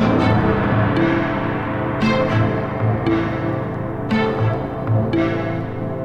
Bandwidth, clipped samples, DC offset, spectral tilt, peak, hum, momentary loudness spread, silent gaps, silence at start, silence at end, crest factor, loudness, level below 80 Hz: 6.6 kHz; under 0.1%; under 0.1%; -8.5 dB/octave; -4 dBFS; none; 7 LU; none; 0 s; 0 s; 14 dB; -19 LUFS; -38 dBFS